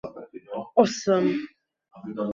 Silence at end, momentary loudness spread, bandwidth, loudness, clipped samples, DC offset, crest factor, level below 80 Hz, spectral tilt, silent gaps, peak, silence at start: 0 s; 21 LU; 7.6 kHz; -24 LUFS; under 0.1%; under 0.1%; 22 dB; -66 dBFS; -5.5 dB/octave; none; -6 dBFS; 0.05 s